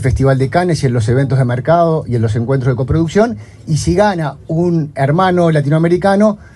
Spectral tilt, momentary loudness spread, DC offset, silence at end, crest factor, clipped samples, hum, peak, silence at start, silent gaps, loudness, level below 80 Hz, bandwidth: -7.5 dB/octave; 5 LU; under 0.1%; 0.1 s; 12 dB; under 0.1%; none; 0 dBFS; 0 s; none; -13 LUFS; -32 dBFS; 11.5 kHz